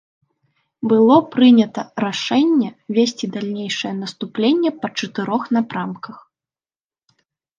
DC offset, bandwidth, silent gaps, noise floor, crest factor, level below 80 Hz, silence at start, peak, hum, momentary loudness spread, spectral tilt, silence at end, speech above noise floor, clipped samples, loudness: under 0.1%; 7.4 kHz; none; under -90 dBFS; 16 dB; -70 dBFS; 0.8 s; -2 dBFS; none; 14 LU; -5.5 dB/octave; 1.45 s; over 73 dB; under 0.1%; -18 LUFS